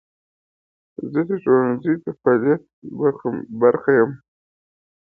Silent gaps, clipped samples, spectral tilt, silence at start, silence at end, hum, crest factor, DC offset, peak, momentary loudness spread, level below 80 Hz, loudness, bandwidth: 2.73-2.82 s; under 0.1%; -12 dB/octave; 1 s; 0.85 s; none; 18 dB; under 0.1%; -2 dBFS; 10 LU; -66 dBFS; -20 LUFS; 3.7 kHz